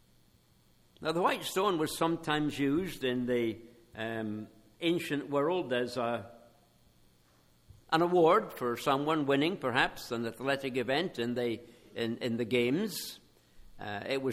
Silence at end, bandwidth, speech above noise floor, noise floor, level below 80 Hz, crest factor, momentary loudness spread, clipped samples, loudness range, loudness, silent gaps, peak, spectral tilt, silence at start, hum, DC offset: 0 s; 16 kHz; 34 dB; -65 dBFS; -64 dBFS; 22 dB; 11 LU; under 0.1%; 5 LU; -32 LUFS; none; -10 dBFS; -5 dB/octave; 1 s; none; under 0.1%